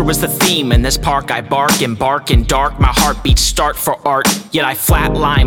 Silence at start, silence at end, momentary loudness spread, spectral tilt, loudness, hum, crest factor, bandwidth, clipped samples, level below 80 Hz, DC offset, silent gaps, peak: 0 s; 0 s; 4 LU; -4 dB/octave; -13 LUFS; none; 12 dB; 19.5 kHz; under 0.1%; -20 dBFS; under 0.1%; none; 0 dBFS